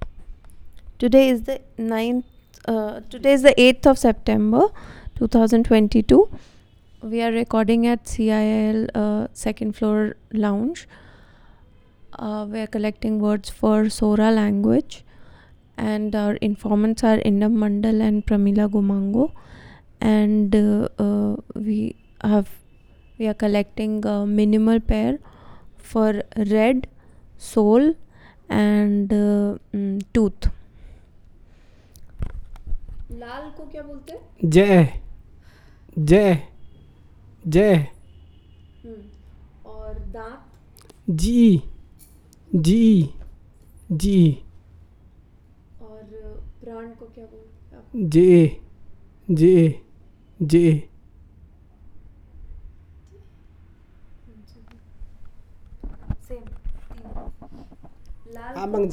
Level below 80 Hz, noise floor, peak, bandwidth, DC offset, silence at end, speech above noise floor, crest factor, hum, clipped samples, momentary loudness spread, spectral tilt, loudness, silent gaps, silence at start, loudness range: -38 dBFS; -51 dBFS; 0 dBFS; 13 kHz; under 0.1%; 0 s; 33 dB; 22 dB; none; under 0.1%; 23 LU; -7 dB/octave; -19 LUFS; none; 0 s; 10 LU